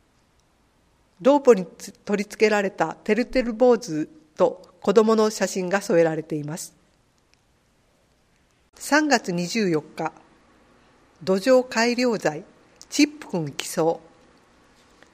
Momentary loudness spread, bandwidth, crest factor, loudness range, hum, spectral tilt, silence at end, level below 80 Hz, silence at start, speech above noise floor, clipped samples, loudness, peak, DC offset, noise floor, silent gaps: 13 LU; 15.5 kHz; 22 dB; 6 LU; none; -4.5 dB/octave; 1.15 s; -56 dBFS; 1.2 s; 41 dB; under 0.1%; -22 LUFS; -2 dBFS; under 0.1%; -63 dBFS; none